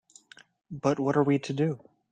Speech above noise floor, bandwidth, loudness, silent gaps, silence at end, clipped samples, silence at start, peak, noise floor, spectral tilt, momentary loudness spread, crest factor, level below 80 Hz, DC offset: 29 dB; 9.2 kHz; -27 LUFS; none; 0.35 s; under 0.1%; 0.7 s; -12 dBFS; -55 dBFS; -7 dB/octave; 13 LU; 18 dB; -68 dBFS; under 0.1%